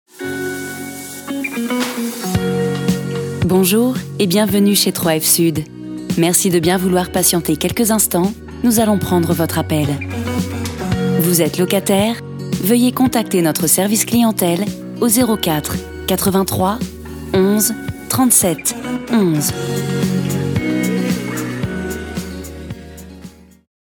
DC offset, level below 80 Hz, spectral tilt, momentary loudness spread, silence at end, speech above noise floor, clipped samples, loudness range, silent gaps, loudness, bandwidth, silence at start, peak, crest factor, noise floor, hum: under 0.1%; -40 dBFS; -4.5 dB/octave; 12 LU; 0.5 s; 23 dB; under 0.1%; 5 LU; none; -16 LUFS; over 20 kHz; 0.15 s; 0 dBFS; 16 dB; -38 dBFS; none